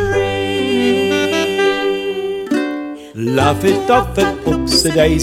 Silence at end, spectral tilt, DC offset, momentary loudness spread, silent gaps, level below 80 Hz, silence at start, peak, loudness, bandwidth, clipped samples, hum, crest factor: 0 s; -4.5 dB/octave; under 0.1%; 8 LU; none; -32 dBFS; 0 s; 0 dBFS; -15 LUFS; 16.5 kHz; under 0.1%; none; 14 dB